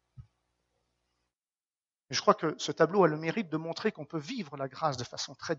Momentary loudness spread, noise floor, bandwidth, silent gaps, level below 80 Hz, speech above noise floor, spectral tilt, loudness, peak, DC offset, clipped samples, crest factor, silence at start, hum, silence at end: 12 LU; under -90 dBFS; 8 kHz; none; -72 dBFS; over 59 dB; -4 dB/octave; -31 LUFS; -8 dBFS; under 0.1%; under 0.1%; 24 dB; 0.2 s; none; 0 s